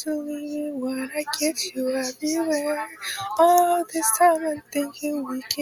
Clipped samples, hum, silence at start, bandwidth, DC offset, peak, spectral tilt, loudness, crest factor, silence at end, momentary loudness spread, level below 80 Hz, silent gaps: under 0.1%; none; 0 s; 19 kHz; under 0.1%; -4 dBFS; -1.5 dB/octave; -24 LUFS; 20 dB; 0 s; 12 LU; -72 dBFS; none